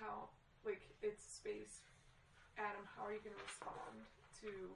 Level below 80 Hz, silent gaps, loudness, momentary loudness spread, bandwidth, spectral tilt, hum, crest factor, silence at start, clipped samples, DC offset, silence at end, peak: -74 dBFS; none; -51 LUFS; 14 LU; 11 kHz; -3.5 dB/octave; none; 18 dB; 0 s; under 0.1%; under 0.1%; 0 s; -34 dBFS